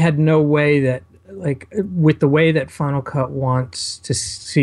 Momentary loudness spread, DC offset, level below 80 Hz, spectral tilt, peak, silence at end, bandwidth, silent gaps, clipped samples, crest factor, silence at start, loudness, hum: 10 LU; under 0.1%; -50 dBFS; -6 dB/octave; -2 dBFS; 0 s; 11.5 kHz; none; under 0.1%; 16 dB; 0 s; -18 LUFS; none